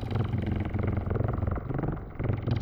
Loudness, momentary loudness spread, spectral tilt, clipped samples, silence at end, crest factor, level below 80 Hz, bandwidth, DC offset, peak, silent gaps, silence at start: -31 LUFS; 3 LU; -10 dB/octave; under 0.1%; 0 s; 14 dB; -38 dBFS; 5.6 kHz; under 0.1%; -16 dBFS; none; 0 s